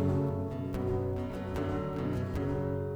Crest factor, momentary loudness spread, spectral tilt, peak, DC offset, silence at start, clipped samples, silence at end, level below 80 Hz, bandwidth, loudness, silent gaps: 14 dB; 4 LU; -9 dB/octave; -18 dBFS; under 0.1%; 0 s; under 0.1%; 0 s; -46 dBFS; 16 kHz; -34 LUFS; none